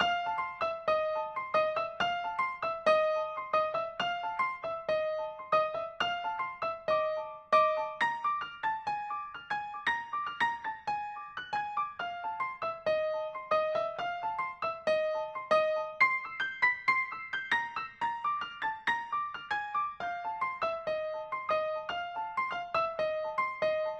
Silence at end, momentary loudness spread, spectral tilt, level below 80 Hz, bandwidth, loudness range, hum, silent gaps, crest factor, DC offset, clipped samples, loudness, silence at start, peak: 0 s; 8 LU; -3.5 dB/octave; -70 dBFS; 8.8 kHz; 4 LU; none; none; 20 dB; under 0.1%; under 0.1%; -32 LUFS; 0 s; -14 dBFS